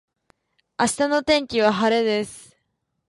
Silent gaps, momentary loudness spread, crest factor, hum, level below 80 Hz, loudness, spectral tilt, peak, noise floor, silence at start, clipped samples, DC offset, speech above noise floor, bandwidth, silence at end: none; 9 LU; 20 dB; none; -58 dBFS; -21 LUFS; -3.5 dB/octave; -4 dBFS; -75 dBFS; 0.8 s; under 0.1%; under 0.1%; 55 dB; 11.5 kHz; 0.7 s